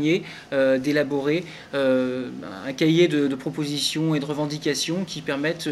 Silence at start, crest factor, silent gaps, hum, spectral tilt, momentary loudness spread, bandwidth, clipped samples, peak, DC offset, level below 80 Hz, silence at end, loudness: 0 s; 18 dB; none; none; -5 dB/octave; 8 LU; 14 kHz; under 0.1%; -6 dBFS; under 0.1%; -62 dBFS; 0 s; -24 LUFS